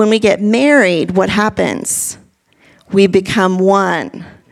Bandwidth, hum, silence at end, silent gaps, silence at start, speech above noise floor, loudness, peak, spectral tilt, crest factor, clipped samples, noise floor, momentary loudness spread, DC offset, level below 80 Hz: 15.5 kHz; none; 0.2 s; none; 0 s; 38 dB; -13 LUFS; 0 dBFS; -4.5 dB/octave; 14 dB; under 0.1%; -50 dBFS; 9 LU; under 0.1%; -48 dBFS